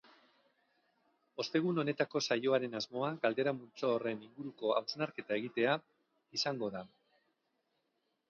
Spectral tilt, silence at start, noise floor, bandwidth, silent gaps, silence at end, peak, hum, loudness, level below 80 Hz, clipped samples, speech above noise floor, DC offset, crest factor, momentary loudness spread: -3.5 dB/octave; 1.4 s; -82 dBFS; 7 kHz; none; 1.45 s; -18 dBFS; none; -36 LUFS; -84 dBFS; under 0.1%; 46 dB; under 0.1%; 20 dB; 9 LU